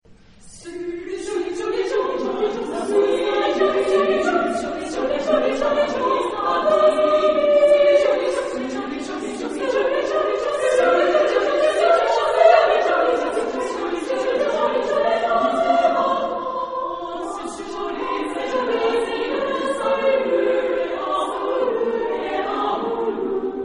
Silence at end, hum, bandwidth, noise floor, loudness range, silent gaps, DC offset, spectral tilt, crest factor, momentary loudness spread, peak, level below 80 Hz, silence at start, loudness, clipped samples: 0 s; none; 10.5 kHz; -46 dBFS; 6 LU; none; under 0.1%; -3.5 dB/octave; 18 dB; 11 LU; -2 dBFS; -52 dBFS; 0.1 s; -20 LUFS; under 0.1%